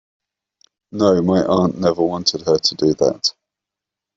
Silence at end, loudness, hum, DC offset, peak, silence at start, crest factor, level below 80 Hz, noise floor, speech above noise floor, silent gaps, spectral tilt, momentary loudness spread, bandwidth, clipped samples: 0.85 s; -17 LUFS; none; under 0.1%; -2 dBFS; 0.95 s; 18 dB; -54 dBFS; -85 dBFS; 69 dB; none; -5 dB/octave; 4 LU; 7.8 kHz; under 0.1%